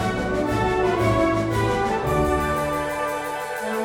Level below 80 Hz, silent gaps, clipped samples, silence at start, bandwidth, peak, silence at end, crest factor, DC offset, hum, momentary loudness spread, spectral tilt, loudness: -36 dBFS; none; under 0.1%; 0 s; 17.5 kHz; -8 dBFS; 0 s; 14 dB; under 0.1%; none; 6 LU; -6 dB/octave; -22 LUFS